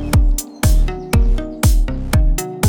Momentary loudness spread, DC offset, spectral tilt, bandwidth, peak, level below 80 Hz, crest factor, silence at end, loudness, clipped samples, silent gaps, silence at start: 4 LU; under 0.1%; -5.5 dB/octave; over 20 kHz; -2 dBFS; -16 dBFS; 12 dB; 0 s; -18 LUFS; under 0.1%; none; 0 s